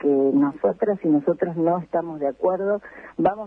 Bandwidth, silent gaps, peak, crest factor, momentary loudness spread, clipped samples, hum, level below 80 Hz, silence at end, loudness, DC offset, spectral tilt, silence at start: 3.6 kHz; none; -6 dBFS; 16 dB; 8 LU; under 0.1%; none; -62 dBFS; 0 s; -22 LUFS; under 0.1%; -11 dB/octave; 0 s